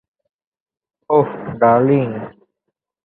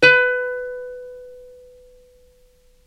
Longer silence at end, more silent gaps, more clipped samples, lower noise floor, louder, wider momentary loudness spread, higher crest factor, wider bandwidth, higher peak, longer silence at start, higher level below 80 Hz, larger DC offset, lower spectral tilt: second, 0.75 s vs 1.45 s; neither; neither; first, -78 dBFS vs -54 dBFS; first, -16 LUFS vs -19 LUFS; second, 15 LU vs 27 LU; about the same, 18 dB vs 22 dB; second, 4 kHz vs 10 kHz; about the same, -2 dBFS vs 0 dBFS; first, 1.1 s vs 0 s; about the same, -58 dBFS vs -54 dBFS; neither; first, -12.5 dB/octave vs -3.5 dB/octave